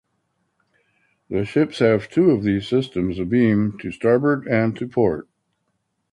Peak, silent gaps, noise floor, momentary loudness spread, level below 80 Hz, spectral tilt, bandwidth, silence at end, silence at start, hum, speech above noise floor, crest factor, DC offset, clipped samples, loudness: -4 dBFS; none; -73 dBFS; 7 LU; -50 dBFS; -8 dB/octave; 10.5 kHz; 0.9 s; 1.3 s; none; 53 dB; 16 dB; under 0.1%; under 0.1%; -20 LUFS